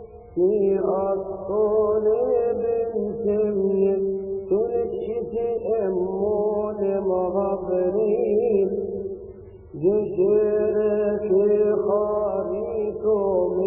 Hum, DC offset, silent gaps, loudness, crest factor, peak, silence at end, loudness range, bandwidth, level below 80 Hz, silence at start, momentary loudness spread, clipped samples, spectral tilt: none; under 0.1%; none; -23 LUFS; 14 dB; -8 dBFS; 0 s; 2 LU; 2.9 kHz; -52 dBFS; 0 s; 7 LU; under 0.1%; -13.5 dB/octave